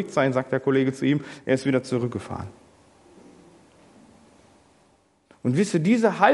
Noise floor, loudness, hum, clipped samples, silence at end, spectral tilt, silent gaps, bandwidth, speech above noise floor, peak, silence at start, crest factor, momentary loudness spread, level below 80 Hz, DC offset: -62 dBFS; -24 LUFS; none; under 0.1%; 0 s; -6.5 dB/octave; none; 11.5 kHz; 39 dB; -2 dBFS; 0 s; 22 dB; 12 LU; -66 dBFS; under 0.1%